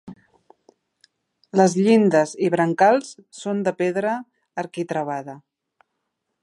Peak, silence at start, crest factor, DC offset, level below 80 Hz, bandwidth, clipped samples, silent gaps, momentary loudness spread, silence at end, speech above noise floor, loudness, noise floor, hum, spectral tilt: -2 dBFS; 0.05 s; 20 dB; under 0.1%; -72 dBFS; 11.5 kHz; under 0.1%; none; 16 LU; 1.05 s; 58 dB; -21 LUFS; -77 dBFS; none; -6 dB/octave